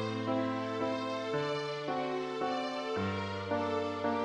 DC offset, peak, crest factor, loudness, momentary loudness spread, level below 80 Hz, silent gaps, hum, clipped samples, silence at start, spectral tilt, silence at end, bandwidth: under 0.1%; -20 dBFS; 14 dB; -35 LUFS; 2 LU; -72 dBFS; none; none; under 0.1%; 0 s; -6 dB/octave; 0 s; 10.5 kHz